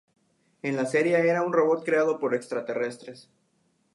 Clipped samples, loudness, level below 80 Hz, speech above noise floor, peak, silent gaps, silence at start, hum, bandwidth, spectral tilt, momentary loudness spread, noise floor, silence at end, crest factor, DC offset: under 0.1%; -25 LUFS; -80 dBFS; 45 dB; -10 dBFS; none; 0.65 s; none; 11.5 kHz; -6 dB/octave; 11 LU; -70 dBFS; 0.75 s; 16 dB; under 0.1%